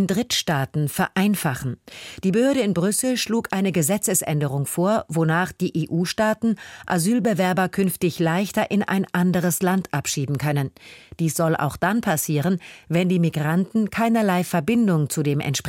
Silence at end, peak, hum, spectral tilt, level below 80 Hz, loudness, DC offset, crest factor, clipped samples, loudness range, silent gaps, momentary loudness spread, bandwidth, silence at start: 0 s; -8 dBFS; none; -5 dB/octave; -56 dBFS; -22 LUFS; under 0.1%; 14 dB; under 0.1%; 2 LU; none; 5 LU; 17 kHz; 0 s